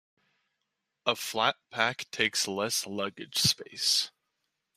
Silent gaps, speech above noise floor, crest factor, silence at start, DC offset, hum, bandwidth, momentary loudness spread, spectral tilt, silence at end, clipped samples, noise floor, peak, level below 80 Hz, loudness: none; 53 dB; 24 dB; 1.05 s; under 0.1%; none; 15 kHz; 7 LU; -1.5 dB/octave; 0.7 s; under 0.1%; -83 dBFS; -8 dBFS; -70 dBFS; -29 LUFS